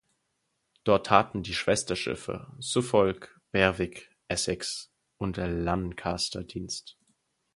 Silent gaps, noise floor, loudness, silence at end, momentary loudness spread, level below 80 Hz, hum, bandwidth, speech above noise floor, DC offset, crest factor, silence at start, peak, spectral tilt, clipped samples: none; -78 dBFS; -29 LUFS; 0.65 s; 13 LU; -50 dBFS; none; 11.5 kHz; 50 dB; under 0.1%; 26 dB; 0.85 s; -4 dBFS; -4 dB/octave; under 0.1%